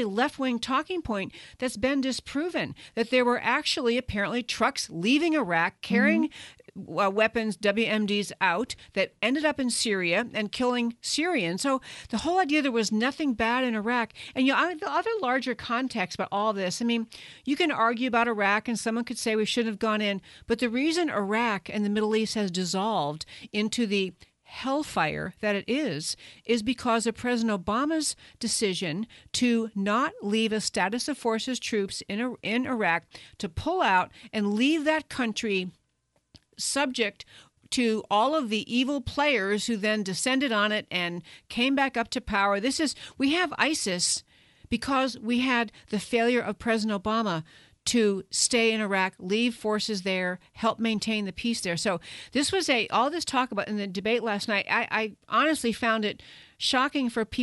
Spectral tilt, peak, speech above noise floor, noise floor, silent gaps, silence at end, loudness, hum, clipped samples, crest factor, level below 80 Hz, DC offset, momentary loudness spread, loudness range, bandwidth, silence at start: -3.5 dB/octave; -8 dBFS; 46 dB; -73 dBFS; none; 0 s; -27 LUFS; none; under 0.1%; 18 dB; -58 dBFS; under 0.1%; 8 LU; 3 LU; 11.5 kHz; 0 s